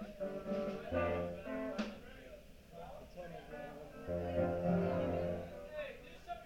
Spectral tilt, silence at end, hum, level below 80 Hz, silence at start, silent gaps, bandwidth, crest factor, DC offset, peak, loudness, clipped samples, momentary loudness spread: -7.5 dB/octave; 0 s; none; -58 dBFS; 0 s; none; 16 kHz; 18 dB; under 0.1%; -24 dBFS; -40 LUFS; under 0.1%; 18 LU